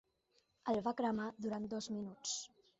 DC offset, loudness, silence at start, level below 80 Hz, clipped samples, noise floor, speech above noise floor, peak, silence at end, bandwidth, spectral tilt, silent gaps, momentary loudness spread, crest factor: under 0.1%; -41 LUFS; 0.65 s; -76 dBFS; under 0.1%; -78 dBFS; 38 dB; -24 dBFS; 0.3 s; 8 kHz; -4 dB/octave; none; 6 LU; 18 dB